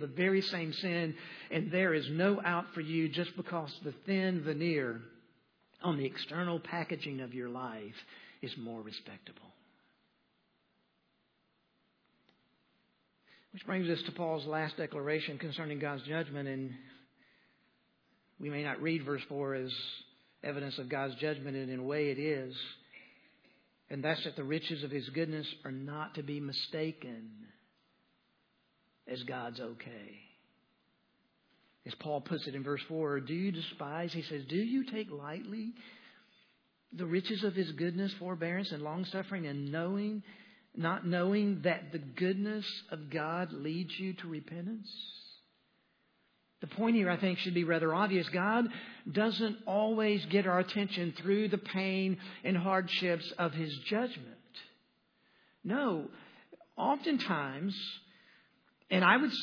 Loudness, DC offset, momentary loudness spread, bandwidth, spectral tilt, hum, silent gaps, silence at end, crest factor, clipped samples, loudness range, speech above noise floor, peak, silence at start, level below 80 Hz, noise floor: -35 LUFS; under 0.1%; 15 LU; 5.4 kHz; -4 dB/octave; none; none; 0 s; 26 dB; under 0.1%; 11 LU; 42 dB; -12 dBFS; 0 s; -90 dBFS; -77 dBFS